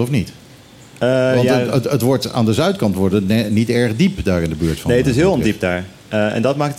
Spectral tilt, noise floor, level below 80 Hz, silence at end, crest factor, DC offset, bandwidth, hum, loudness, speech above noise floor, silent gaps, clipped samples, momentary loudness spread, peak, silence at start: -6.5 dB/octave; -42 dBFS; -38 dBFS; 0 s; 14 dB; under 0.1%; 16 kHz; none; -17 LUFS; 26 dB; none; under 0.1%; 6 LU; -4 dBFS; 0 s